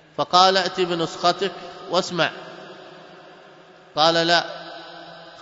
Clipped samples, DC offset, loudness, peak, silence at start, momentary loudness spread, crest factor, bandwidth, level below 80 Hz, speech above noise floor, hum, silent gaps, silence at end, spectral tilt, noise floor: under 0.1%; under 0.1%; -20 LUFS; 0 dBFS; 0.2 s; 24 LU; 24 dB; 8 kHz; -68 dBFS; 28 dB; none; none; 0 s; -3.5 dB/octave; -48 dBFS